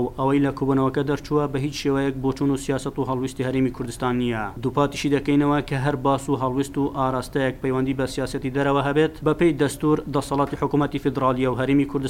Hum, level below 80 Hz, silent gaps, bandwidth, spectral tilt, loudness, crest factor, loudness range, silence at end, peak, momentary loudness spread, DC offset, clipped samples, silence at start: none; -42 dBFS; none; 16 kHz; -6.5 dB/octave; -23 LUFS; 16 dB; 2 LU; 0 s; -6 dBFS; 5 LU; under 0.1%; under 0.1%; 0 s